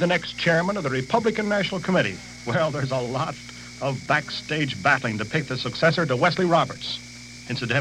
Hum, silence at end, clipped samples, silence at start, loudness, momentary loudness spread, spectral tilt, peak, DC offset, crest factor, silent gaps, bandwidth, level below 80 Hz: 60 Hz at -50 dBFS; 0 s; under 0.1%; 0 s; -24 LUFS; 10 LU; -5 dB/octave; -6 dBFS; under 0.1%; 18 dB; none; 12.5 kHz; -54 dBFS